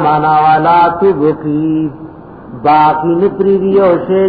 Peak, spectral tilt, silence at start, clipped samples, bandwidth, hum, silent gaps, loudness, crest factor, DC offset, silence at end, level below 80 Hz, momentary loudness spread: 0 dBFS; -10.5 dB/octave; 0 s; under 0.1%; 5 kHz; none; none; -11 LUFS; 10 dB; 0.2%; 0 s; -44 dBFS; 10 LU